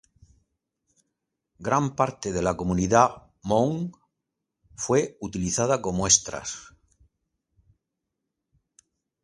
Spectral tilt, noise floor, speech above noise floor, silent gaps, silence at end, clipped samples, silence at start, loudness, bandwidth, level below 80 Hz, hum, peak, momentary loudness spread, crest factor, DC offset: -4 dB/octave; -83 dBFS; 59 dB; none; 2.55 s; under 0.1%; 1.6 s; -24 LUFS; 11.5 kHz; -50 dBFS; none; -2 dBFS; 15 LU; 26 dB; under 0.1%